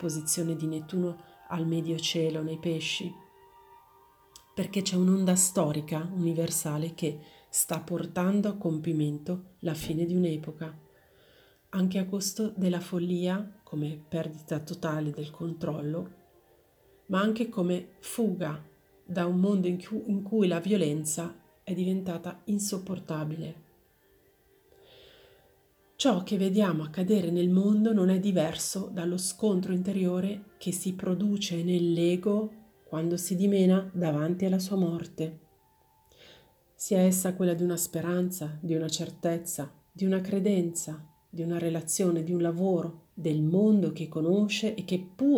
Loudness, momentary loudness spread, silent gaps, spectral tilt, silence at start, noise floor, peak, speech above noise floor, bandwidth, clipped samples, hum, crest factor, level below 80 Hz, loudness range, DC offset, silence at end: -29 LUFS; 11 LU; none; -5.5 dB/octave; 0 s; -65 dBFS; -12 dBFS; 36 dB; over 20 kHz; under 0.1%; none; 18 dB; -68 dBFS; 6 LU; under 0.1%; 0 s